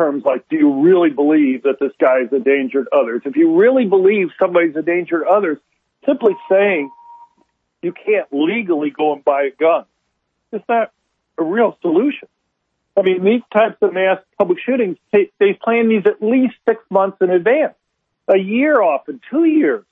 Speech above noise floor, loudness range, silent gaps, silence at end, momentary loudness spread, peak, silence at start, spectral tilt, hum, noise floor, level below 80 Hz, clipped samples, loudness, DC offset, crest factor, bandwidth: 56 dB; 4 LU; none; 0.1 s; 8 LU; -2 dBFS; 0 s; -9 dB/octave; none; -71 dBFS; -72 dBFS; under 0.1%; -16 LUFS; under 0.1%; 14 dB; 3.9 kHz